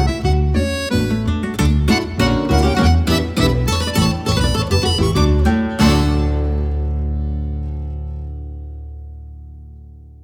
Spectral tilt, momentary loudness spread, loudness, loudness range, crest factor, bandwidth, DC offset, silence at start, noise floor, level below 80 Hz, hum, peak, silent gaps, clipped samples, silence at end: -6 dB/octave; 17 LU; -17 LUFS; 9 LU; 16 dB; 16.5 kHz; under 0.1%; 0 s; -38 dBFS; -22 dBFS; none; -2 dBFS; none; under 0.1%; 0.05 s